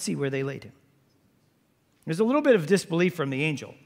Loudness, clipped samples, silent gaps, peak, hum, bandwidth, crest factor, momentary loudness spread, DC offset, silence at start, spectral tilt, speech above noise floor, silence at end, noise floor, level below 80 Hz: -25 LUFS; under 0.1%; none; -8 dBFS; none; 16 kHz; 18 dB; 13 LU; under 0.1%; 0 s; -5.5 dB/octave; 42 dB; 0.1 s; -67 dBFS; -74 dBFS